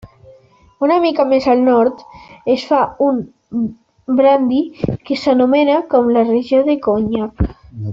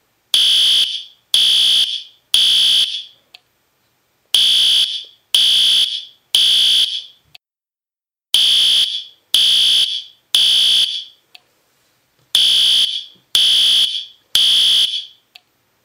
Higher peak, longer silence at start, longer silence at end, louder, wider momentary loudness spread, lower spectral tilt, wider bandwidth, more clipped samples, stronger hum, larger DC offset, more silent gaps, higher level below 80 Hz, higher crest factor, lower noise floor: about the same, -2 dBFS vs 0 dBFS; second, 0.05 s vs 0.35 s; second, 0 s vs 0.75 s; second, -15 LUFS vs -12 LUFS; about the same, 10 LU vs 10 LU; first, -8 dB/octave vs 3 dB/octave; second, 7.4 kHz vs 16.5 kHz; neither; neither; neither; neither; first, -38 dBFS vs -64 dBFS; about the same, 14 dB vs 16 dB; second, -47 dBFS vs under -90 dBFS